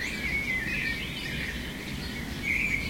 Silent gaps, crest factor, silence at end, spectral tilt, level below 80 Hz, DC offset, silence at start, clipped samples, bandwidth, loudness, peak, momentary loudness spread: none; 16 dB; 0 s; -3.5 dB/octave; -42 dBFS; 0.1%; 0 s; under 0.1%; 16.5 kHz; -30 LUFS; -16 dBFS; 8 LU